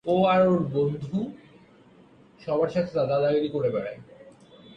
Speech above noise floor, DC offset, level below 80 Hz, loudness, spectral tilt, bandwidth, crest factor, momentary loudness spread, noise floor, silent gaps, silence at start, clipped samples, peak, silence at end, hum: 30 dB; under 0.1%; -62 dBFS; -25 LUFS; -8.5 dB/octave; 7.4 kHz; 16 dB; 16 LU; -54 dBFS; none; 0.05 s; under 0.1%; -10 dBFS; 0.55 s; none